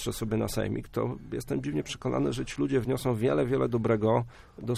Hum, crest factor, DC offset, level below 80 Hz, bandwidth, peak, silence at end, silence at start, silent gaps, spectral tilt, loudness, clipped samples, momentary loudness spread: none; 16 dB; under 0.1%; -48 dBFS; 15 kHz; -12 dBFS; 0 s; 0 s; none; -6.5 dB/octave; -29 LUFS; under 0.1%; 7 LU